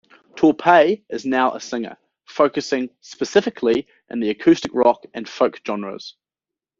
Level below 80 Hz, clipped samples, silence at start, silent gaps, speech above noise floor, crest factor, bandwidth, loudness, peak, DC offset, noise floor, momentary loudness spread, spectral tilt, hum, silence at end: -62 dBFS; under 0.1%; 0.35 s; none; 69 dB; 18 dB; 7.6 kHz; -19 LUFS; -2 dBFS; under 0.1%; -89 dBFS; 17 LU; -3.5 dB/octave; none; 0.7 s